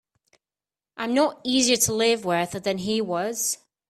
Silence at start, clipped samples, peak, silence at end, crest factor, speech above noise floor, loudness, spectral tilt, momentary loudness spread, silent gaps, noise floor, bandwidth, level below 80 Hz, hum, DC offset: 0.95 s; under 0.1%; -4 dBFS; 0.35 s; 20 dB; over 67 dB; -23 LUFS; -2.5 dB/octave; 7 LU; none; under -90 dBFS; 15.5 kHz; -62 dBFS; none; under 0.1%